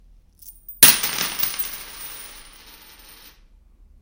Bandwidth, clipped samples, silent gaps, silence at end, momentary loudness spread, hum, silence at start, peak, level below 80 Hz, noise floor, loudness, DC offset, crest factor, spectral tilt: 17 kHz; under 0.1%; none; 1.6 s; 27 LU; none; 0.45 s; 0 dBFS; -50 dBFS; -52 dBFS; -16 LUFS; under 0.1%; 24 dB; 0.5 dB/octave